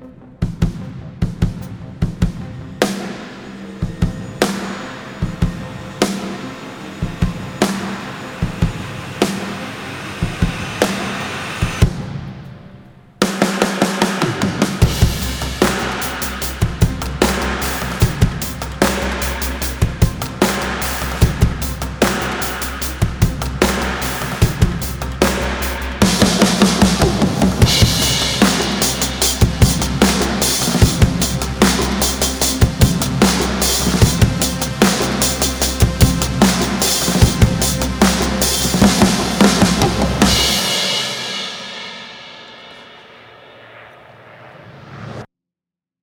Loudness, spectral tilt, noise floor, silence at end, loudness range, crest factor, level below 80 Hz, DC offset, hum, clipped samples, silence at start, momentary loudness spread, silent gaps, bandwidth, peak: -17 LUFS; -4 dB/octave; -87 dBFS; 0.75 s; 9 LU; 18 dB; -26 dBFS; under 0.1%; none; under 0.1%; 0 s; 14 LU; none; over 20 kHz; 0 dBFS